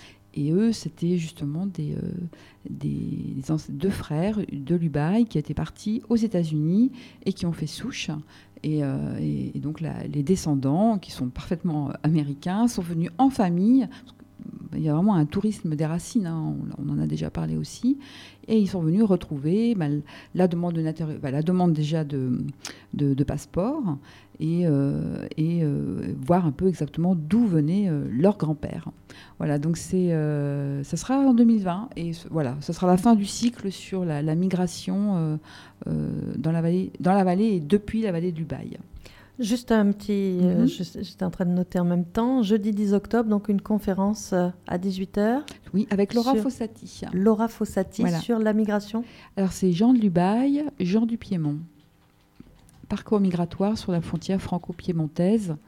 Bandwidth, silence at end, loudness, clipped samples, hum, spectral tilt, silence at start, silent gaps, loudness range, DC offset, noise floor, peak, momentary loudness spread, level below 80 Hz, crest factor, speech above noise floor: 15 kHz; 0.1 s; -25 LUFS; under 0.1%; none; -7.5 dB/octave; 0 s; none; 4 LU; under 0.1%; -60 dBFS; -6 dBFS; 10 LU; -52 dBFS; 18 dB; 35 dB